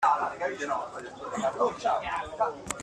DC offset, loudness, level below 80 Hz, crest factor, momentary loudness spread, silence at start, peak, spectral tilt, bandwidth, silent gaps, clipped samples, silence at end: under 0.1%; -30 LUFS; -60 dBFS; 18 dB; 8 LU; 0 s; -12 dBFS; -3.5 dB/octave; 13 kHz; none; under 0.1%; 0 s